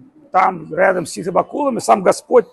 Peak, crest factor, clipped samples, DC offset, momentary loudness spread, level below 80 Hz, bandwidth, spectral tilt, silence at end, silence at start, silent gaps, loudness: 0 dBFS; 16 dB; under 0.1%; under 0.1%; 6 LU; -60 dBFS; 12.5 kHz; -5 dB/octave; 0.1 s; 0.35 s; none; -16 LUFS